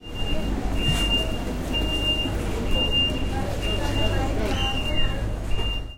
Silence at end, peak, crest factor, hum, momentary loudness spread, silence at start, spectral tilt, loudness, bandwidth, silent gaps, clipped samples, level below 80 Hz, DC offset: 0 s; -10 dBFS; 14 dB; none; 7 LU; 0 s; -4.5 dB/octave; -25 LUFS; 16.5 kHz; none; under 0.1%; -28 dBFS; under 0.1%